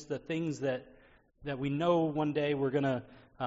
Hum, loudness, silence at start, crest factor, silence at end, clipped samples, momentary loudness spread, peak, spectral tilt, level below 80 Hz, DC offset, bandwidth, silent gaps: none; -33 LUFS; 0 s; 18 dB; 0 s; under 0.1%; 10 LU; -16 dBFS; -6 dB/octave; -64 dBFS; under 0.1%; 7.6 kHz; none